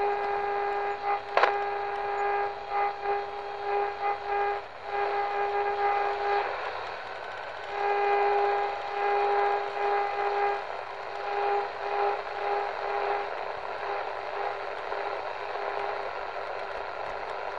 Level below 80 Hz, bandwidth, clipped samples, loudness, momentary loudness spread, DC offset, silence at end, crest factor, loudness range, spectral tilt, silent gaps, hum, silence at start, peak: -64 dBFS; 7.8 kHz; under 0.1%; -30 LUFS; 9 LU; 0.3%; 0 s; 24 dB; 5 LU; -4 dB/octave; none; none; 0 s; -6 dBFS